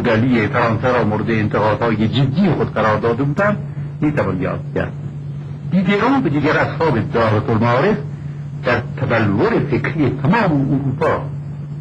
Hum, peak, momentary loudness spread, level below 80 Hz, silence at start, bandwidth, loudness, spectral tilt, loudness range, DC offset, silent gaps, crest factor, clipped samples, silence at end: none; -4 dBFS; 11 LU; -42 dBFS; 0 s; 8 kHz; -17 LUFS; -8.5 dB/octave; 3 LU; under 0.1%; none; 12 dB; under 0.1%; 0 s